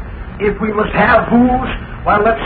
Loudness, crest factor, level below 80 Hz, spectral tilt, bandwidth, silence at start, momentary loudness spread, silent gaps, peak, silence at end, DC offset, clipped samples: -14 LUFS; 14 dB; -28 dBFS; -5 dB/octave; 4.7 kHz; 0 s; 10 LU; none; 0 dBFS; 0 s; under 0.1%; under 0.1%